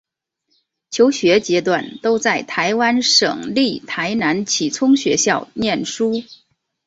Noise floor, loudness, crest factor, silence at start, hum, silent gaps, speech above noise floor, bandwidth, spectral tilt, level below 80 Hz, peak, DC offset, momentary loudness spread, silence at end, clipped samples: -70 dBFS; -17 LUFS; 16 dB; 0.9 s; none; none; 53 dB; 8 kHz; -3 dB/octave; -58 dBFS; -2 dBFS; under 0.1%; 7 LU; 0.5 s; under 0.1%